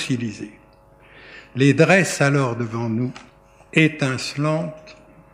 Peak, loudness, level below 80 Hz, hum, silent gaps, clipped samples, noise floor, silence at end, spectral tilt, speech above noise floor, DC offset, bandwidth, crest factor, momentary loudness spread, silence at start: -2 dBFS; -20 LUFS; -58 dBFS; none; none; under 0.1%; -50 dBFS; 0.4 s; -5.5 dB/octave; 31 dB; under 0.1%; 15 kHz; 20 dB; 16 LU; 0 s